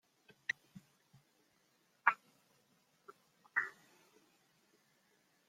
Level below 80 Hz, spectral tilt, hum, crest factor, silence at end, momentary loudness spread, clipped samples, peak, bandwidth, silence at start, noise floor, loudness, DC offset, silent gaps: under -90 dBFS; -2 dB/octave; none; 34 dB; 1.8 s; 12 LU; under 0.1%; -12 dBFS; 16.5 kHz; 0.75 s; -76 dBFS; -39 LUFS; under 0.1%; none